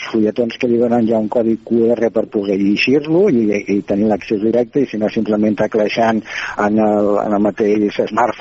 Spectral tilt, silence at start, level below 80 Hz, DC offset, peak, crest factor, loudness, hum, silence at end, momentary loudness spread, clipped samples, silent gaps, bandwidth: -5 dB/octave; 0 s; -52 dBFS; under 0.1%; 0 dBFS; 16 dB; -16 LUFS; none; 0 s; 4 LU; under 0.1%; none; 7.6 kHz